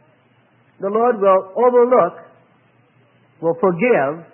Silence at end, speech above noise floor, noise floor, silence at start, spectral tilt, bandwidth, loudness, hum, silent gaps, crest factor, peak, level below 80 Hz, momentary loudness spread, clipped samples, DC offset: 0.1 s; 40 dB; -56 dBFS; 0.8 s; -12 dB/octave; 3.1 kHz; -16 LUFS; none; none; 16 dB; -2 dBFS; -74 dBFS; 9 LU; under 0.1%; under 0.1%